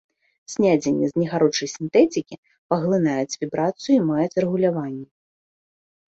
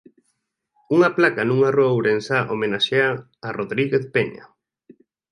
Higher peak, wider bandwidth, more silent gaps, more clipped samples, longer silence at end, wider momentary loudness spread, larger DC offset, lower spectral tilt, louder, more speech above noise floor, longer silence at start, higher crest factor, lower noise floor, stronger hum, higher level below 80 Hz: about the same, -4 dBFS vs -2 dBFS; second, 8 kHz vs 11 kHz; first, 2.38-2.43 s, 2.58-2.69 s vs none; neither; first, 1.1 s vs 0.9 s; about the same, 10 LU vs 9 LU; neither; about the same, -6 dB/octave vs -6.5 dB/octave; about the same, -21 LUFS vs -20 LUFS; first, over 69 dB vs 53 dB; second, 0.5 s vs 0.9 s; about the same, 18 dB vs 20 dB; first, under -90 dBFS vs -73 dBFS; neither; about the same, -64 dBFS vs -64 dBFS